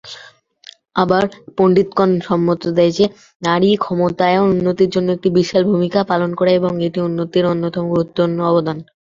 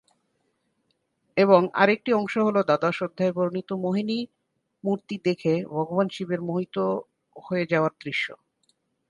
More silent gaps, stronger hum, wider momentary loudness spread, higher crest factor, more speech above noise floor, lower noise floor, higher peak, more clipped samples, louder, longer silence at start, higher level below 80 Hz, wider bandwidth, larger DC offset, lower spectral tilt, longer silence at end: first, 3.35-3.40 s vs none; neither; second, 5 LU vs 10 LU; second, 14 dB vs 22 dB; second, 29 dB vs 49 dB; second, -44 dBFS vs -73 dBFS; first, 0 dBFS vs -4 dBFS; neither; first, -16 LUFS vs -25 LUFS; second, 0.05 s vs 1.35 s; first, -52 dBFS vs -72 dBFS; second, 7.6 kHz vs 10.5 kHz; neither; about the same, -7 dB/octave vs -7 dB/octave; second, 0.25 s vs 0.75 s